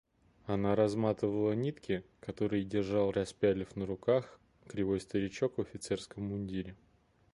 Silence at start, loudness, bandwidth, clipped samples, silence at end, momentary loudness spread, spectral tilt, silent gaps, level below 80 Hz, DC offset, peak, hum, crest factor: 0.45 s; -34 LUFS; 11.5 kHz; under 0.1%; 0.6 s; 9 LU; -7 dB/octave; none; -60 dBFS; under 0.1%; -16 dBFS; none; 18 dB